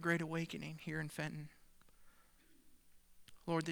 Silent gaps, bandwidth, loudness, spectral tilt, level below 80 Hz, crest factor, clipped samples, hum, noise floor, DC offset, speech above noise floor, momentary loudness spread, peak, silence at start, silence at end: none; over 20 kHz; -43 LUFS; -6 dB/octave; -70 dBFS; 22 dB; under 0.1%; 60 Hz at -75 dBFS; -67 dBFS; under 0.1%; 25 dB; 14 LU; -20 dBFS; 0 s; 0 s